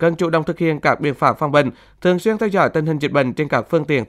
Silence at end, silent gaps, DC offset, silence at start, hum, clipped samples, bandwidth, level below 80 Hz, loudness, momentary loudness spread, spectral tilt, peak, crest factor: 0.05 s; none; under 0.1%; 0 s; none; under 0.1%; 14 kHz; -52 dBFS; -18 LUFS; 3 LU; -7 dB/octave; 0 dBFS; 18 dB